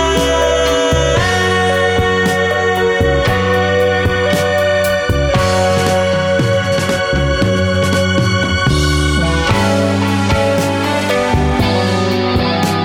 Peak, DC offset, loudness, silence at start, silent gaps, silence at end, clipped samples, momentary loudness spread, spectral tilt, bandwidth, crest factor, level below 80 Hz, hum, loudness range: 0 dBFS; under 0.1%; -13 LUFS; 0 s; none; 0 s; under 0.1%; 2 LU; -5 dB/octave; 20 kHz; 12 dB; -26 dBFS; none; 1 LU